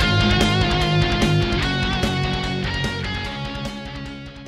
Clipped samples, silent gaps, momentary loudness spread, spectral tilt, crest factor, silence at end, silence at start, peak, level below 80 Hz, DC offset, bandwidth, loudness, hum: under 0.1%; none; 13 LU; -5.5 dB/octave; 16 dB; 0 s; 0 s; -4 dBFS; -30 dBFS; under 0.1%; 14.5 kHz; -21 LUFS; none